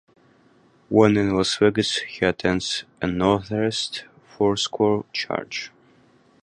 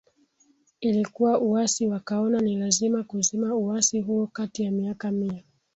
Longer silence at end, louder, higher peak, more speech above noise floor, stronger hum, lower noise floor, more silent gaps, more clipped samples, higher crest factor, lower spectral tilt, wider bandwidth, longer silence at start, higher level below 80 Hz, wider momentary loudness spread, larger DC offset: first, 0.75 s vs 0.35 s; first, -22 LUFS vs -25 LUFS; first, -2 dBFS vs -8 dBFS; second, 35 dB vs 40 dB; neither; second, -57 dBFS vs -64 dBFS; neither; neither; about the same, 22 dB vs 18 dB; about the same, -4.5 dB/octave vs -4.5 dB/octave; first, 11 kHz vs 8.2 kHz; about the same, 0.9 s vs 0.8 s; first, -50 dBFS vs -66 dBFS; first, 10 LU vs 7 LU; neither